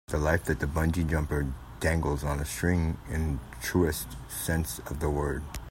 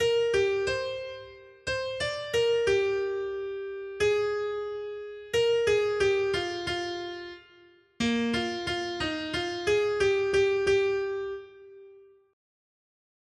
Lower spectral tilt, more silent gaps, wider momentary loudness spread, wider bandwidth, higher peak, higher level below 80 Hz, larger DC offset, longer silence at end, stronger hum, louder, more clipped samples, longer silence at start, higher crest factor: first, -5.5 dB/octave vs -4 dB/octave; neither; second, 7 LU vs 13 LU; first, 16.5 kHz vs 12 kHz; first, -8 dBFS vs -14 dBFS; first, -38 dBFS vs -56 dBFS; neither; second, 0 s vs 1.3 s; neither; about the same, -30 LUFS vs -28 LUFS; neither; about the same, 0.1 s vs 0 s; first, 20 dB vs 14 dB